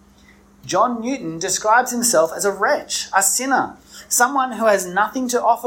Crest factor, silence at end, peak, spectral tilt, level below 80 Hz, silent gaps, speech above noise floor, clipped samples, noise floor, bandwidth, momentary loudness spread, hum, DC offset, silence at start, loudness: 16 dB; 0 s; -2 dBFS; -2 dB/octave; -58 dBFS; none; 31 dB; under 0.1%; -50 dBFS; 16.5 kHz; 8 LU; none; under 0.1%; 0.65 s; -18 LUFS